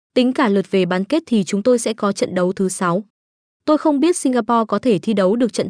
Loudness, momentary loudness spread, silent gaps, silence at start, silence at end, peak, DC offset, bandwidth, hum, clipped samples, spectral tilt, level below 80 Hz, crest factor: -18 LUFS; 4 LU; 3.10-3.60 s; 0.15 s; 0 s; -4 dBFS; under 0.1%; 10.5 kHz; none; under 0.1%; -5.5 dB/octave; -64 dBFS; 14 dB